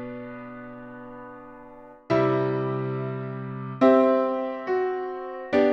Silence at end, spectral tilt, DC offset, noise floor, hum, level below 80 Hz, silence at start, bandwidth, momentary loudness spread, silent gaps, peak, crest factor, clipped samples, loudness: 0 s; -9 dB/octave; under 0.1%; -46 dBFS; none; -62 dBFS; 0 s; 6.6 kHz; 22 LU; none; -6 dBFS; 20 dB; under 0.1%; -25 LUFS